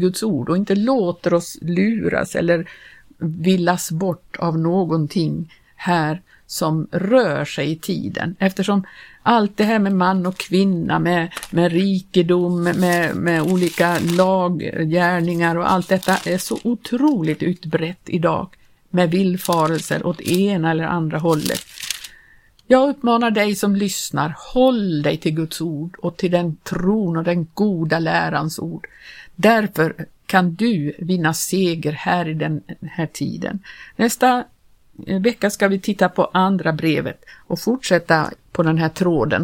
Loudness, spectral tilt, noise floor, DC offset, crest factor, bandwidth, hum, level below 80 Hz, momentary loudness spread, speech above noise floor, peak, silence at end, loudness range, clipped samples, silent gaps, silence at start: -19 LUFS; -5.5 dB/octave; -51 dBFS; under 0.1%; 18 dB; 17 kHz; none; -52 dBFS; 9 LU; 32 dB; 0 dBFS; 0 s; 3 LU; under 0.1%; none; 0 s